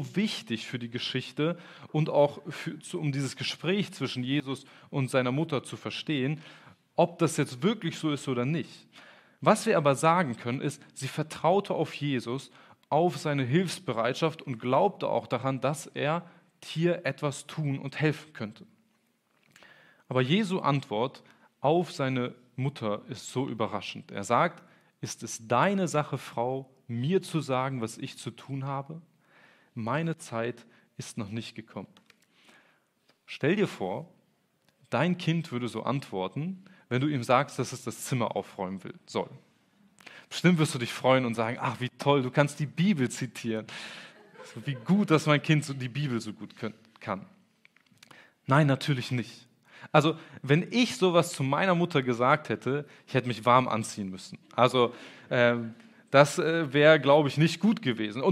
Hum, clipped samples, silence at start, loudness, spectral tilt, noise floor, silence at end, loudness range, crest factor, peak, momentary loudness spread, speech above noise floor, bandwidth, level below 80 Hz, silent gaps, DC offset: none; under 0.1%; 0 s; -29 LUFS; -5.5 dB/octave; -71 dBFS; 0 s; 8 LU; 26 dB; -4 dBFS; 14 LU; 43 dB; 14 kHz; -78 dBFS; none; under 0.1%